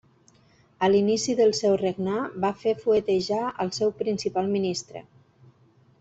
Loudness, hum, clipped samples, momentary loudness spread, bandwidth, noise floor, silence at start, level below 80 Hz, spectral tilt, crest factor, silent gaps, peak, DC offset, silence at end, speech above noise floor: -25 LUFS; none; under 0.1%; 7 LU; 8.2 kHz; -59 dBFS; 0.8 s; -64 dBFS; -5 dB/octave; 18 dB; none; -8 dBFS; under 0.1%; 1 s; 35 dB